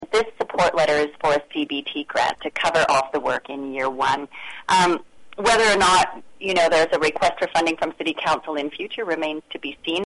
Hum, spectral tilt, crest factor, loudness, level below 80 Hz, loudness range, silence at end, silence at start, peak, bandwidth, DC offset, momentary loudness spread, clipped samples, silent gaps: none; -3 dB/octave; 14 dB; -21 LUFS; -52 dBFS; 4 LU; 0 s; 0 s; -8 dBFS; 11.5 kHz; under 0.1%; 11 LU; under 0.1%; none